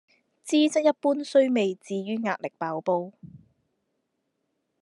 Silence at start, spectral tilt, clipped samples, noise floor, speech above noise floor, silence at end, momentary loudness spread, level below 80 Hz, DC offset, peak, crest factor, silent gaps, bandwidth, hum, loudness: 0.45 s; -5 dB/octave; under 0.1%; -78 dBFS; 53 dB; 1.45 s; 10 LU; -78 dBFS; under 0.1%; -8 dBFS; 18 dB; none; 11.5 kHz; none; -25 LUFS